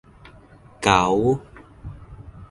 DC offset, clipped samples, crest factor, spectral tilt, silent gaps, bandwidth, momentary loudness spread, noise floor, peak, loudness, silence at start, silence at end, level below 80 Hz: under 0.1%; under 0.1%; 22 dB; -5 dB/octave; none; 11.5 kHz; 25 LU; -48 dBFS; -2 dBFS; -20 LUFS; 0.8 s; 0.05 s; -44 dBFS